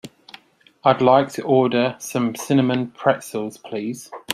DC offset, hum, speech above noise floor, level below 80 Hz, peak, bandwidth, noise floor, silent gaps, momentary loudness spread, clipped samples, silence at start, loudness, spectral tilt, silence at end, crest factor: under 0.1%; none; 31 dB; -62 dBFS; -2 dBFS; 15 kHz; -51 dBFS; none; 13 LU; under 0.1%; 0.05 s; -20 LUFS; -5.5 dB/octave; 0 s; 18 dB